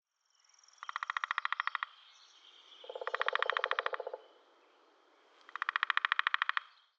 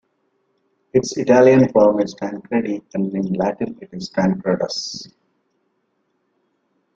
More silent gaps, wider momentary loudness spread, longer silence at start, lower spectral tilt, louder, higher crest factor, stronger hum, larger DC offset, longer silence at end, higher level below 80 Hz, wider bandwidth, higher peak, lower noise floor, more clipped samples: neither; about the same, 18 LU vs 16 LU; second, 0.8 s vs 0.95 s; second, 3.5 dB/octave vs -6 dB/octave; second, -35 LUFS vs -18 LUFS; first, 28 dB vs 18 dB; neither; neither; second, 0.35 s vs 1.9 s; second, under -90 dBFS vs -58 dBFS; about the same, 8 kHz vs 7.6 kHz; second, -10 dBFS vs -2 dBFS; first, -73 dBFS vs -69 dBFS; neither